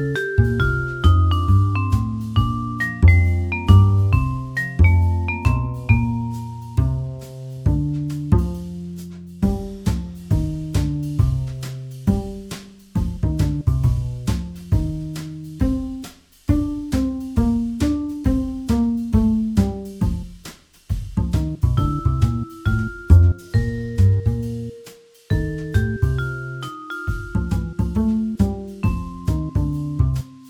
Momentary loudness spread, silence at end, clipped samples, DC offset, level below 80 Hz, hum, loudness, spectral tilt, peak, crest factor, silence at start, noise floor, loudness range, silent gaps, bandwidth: 14 LU; 0 s; under 0.1%; under 0.1%; -26 dBFS; none; -21 LUFS; -7.5 dB/octave; 0 dBFS; 18 dB; 0 s; -45 dBFS; 7 LU; none; 13.5 kHz